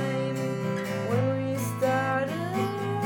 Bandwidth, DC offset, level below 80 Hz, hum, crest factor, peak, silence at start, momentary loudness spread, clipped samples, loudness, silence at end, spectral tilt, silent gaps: 18 kHz; under 0.1%; -68 dBFS; none; 14 dB; -14 dBFS; 0 s; 4 LU; under 0.1%; -28 LUFS; 0 s; -6.5 dB/octave; none